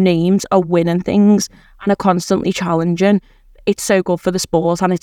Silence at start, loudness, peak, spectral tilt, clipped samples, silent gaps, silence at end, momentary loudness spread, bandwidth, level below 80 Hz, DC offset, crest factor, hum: 0 s; -16 LUFS; 0 dBFS; -6 dB/octave; under 0.1%; none; 0.05 s; 6 LU; 15.5 kHz; -46 dBFS; under 0.1%; 14 dB; none